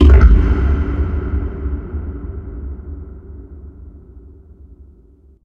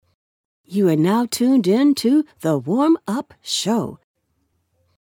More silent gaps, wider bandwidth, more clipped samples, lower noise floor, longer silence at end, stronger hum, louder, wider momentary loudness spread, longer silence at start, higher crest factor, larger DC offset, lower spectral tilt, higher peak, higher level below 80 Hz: neither; second, 3.4 kHz vs 18.5 kHz; neither; second, -47 dBFS vs -69 dBFS; second, 0.6 s vs 1.1 s; neither; about the same, -18 LUFS vs -19 LUFS; first, 25 LU vs 10 LU; second, 0 s vs 0.7 s; about the same, 16 dB vs 14 dB; neither; first, -9.5 dB/octave vs -5.5 dB/octave; first, 0 dBFS vs -6 dBFS; first, -16 dBFS vs -64 dBFS